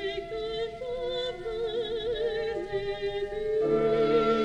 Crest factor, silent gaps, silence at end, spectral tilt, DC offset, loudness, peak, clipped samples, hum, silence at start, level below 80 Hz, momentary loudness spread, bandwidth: 16 dB; none; 0 s; -6 dB/octave; under 0.1%; -30 LUFS; -12 dBFS; under 0.1%; none; 0 s; -50 dBFS; 10 LU; 8.8 kHz